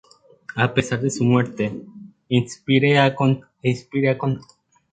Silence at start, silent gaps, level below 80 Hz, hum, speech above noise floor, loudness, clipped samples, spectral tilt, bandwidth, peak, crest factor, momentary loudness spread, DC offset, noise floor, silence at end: 0.55 s; none; -56 dBFS; none; 23 dB; -21 LUFS; under 0.1%; -6 dB/octave; 9.2 kHz; -2 dBFS; 18 dB; 11 LU; under 0.1%; -42 dBFS; 0.5 s